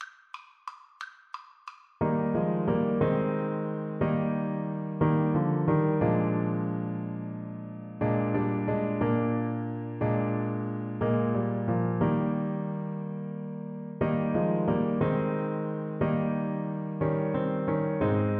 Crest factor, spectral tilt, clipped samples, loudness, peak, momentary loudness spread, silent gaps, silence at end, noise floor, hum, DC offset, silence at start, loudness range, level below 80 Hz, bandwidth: 16 dB; -10.5 dB/octave; under 0.1%; -29 LUFS; -12 dBFS; 14 LU; none; 0 s; -50 dBFS; none; under 0.1%; 0 s; 2 LU; -56 dBFS; 5.2 kHz